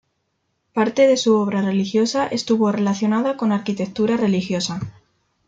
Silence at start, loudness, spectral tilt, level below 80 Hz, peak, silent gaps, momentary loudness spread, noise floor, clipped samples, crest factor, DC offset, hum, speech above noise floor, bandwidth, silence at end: 0.75 s; -19 LUFS; -5.5 dB/octave; -60 dBFS; -4 dBFS; none; 9 LU; -71 dBFS; under 0.1%; 16 dB; under 0.1%; none; 52 dB; 8.8 kHz; 0.55 s